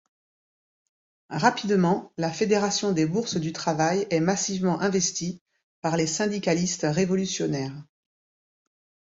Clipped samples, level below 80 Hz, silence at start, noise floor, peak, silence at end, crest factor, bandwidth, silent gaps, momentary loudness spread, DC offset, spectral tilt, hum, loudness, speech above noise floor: under 0.1%; -62 dBFS; 1.3 s; under -90 dBFS; -6 dBFS; 1.25 s; 20 dB; 8 kHz; 5.41-5.46 s, 5.63-5.82 s; 9 LU; under 0.1%; -4.5 dB/octave; none; -25 LUFS; over 65 dB